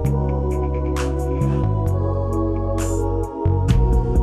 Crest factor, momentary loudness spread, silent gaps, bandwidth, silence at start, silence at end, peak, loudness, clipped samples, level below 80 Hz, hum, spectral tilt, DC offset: 14 dB; 4 LU; none; 13.5 kHz; 0 s; 0 s; -4 dBFS; -21 LUFS; under 0.1%; -24 dBFS; none; -8 dB/octave; under 0.1%